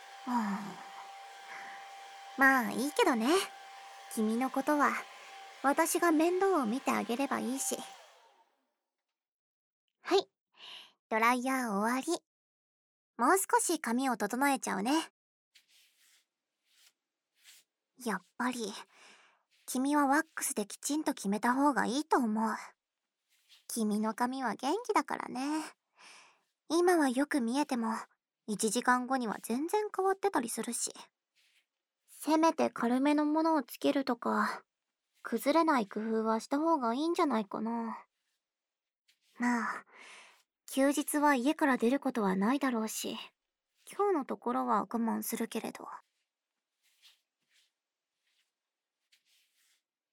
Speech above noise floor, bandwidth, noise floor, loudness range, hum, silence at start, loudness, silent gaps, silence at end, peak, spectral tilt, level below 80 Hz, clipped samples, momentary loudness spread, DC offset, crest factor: over 59 dB; over 20 kHz; under -90 dBFS; 8 LU; none; 0 s; -32 LUFS; 9.28-9.88 s, 10.40-10.47 s, 10.99-11.10 s, 12.27-13.14 s, 15.10-15.52 s, 38.99-39.05 s; 4.15 s; -12 dBFS; -3.5 dB/octave; -84 dBFS; under 0.1%; 19 LU; under 0.1%; 20 dB